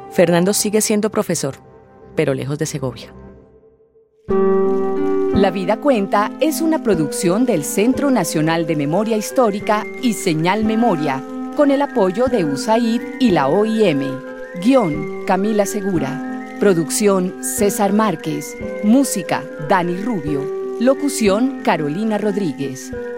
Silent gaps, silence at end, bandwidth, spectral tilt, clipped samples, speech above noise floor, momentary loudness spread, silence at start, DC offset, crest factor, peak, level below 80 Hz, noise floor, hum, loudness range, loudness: none; 0 s; 16 kHz; -5 dB/octave; under 0.1%; 36 dB; 8 LU; 0 s; under 0.1%; 18 dB; 0 dBFS; -48 dBFS; -53 dBFS; none; 3 LU; -18 LUFS